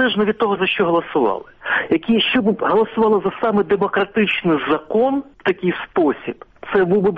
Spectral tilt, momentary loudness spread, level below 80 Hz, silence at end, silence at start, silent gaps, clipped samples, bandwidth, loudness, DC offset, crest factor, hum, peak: -8 dB/octave; 5 LU; -52 dBFS; 0 s; 0 s; none; under 0.1%; 5 kHz; -18 LUFS; under 0.1%; 14 dB; none; -4 dBFS